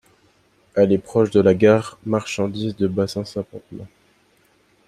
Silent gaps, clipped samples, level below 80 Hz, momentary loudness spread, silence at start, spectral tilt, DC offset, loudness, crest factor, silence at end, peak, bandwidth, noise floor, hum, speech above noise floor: none; under 0.1%; -58 dBFS; 18 LU; 0.75 s; -7 dB/octave; under 0.1%; -20 LUFS; 18 dB; 1 s; -2 dBFS; 13 kHz; -59 dBFS; none; 40 dB